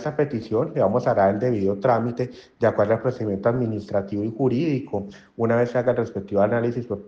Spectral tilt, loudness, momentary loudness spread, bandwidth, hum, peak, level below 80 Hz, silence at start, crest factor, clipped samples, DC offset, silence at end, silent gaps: -9 dB/octave; -23 LUFS; 7 LU; 7.4 kHz; none; -8 dBFS; -60 dBFS; 0 s; 16 dB; under 0.1%; under 0.1%; 0 s; none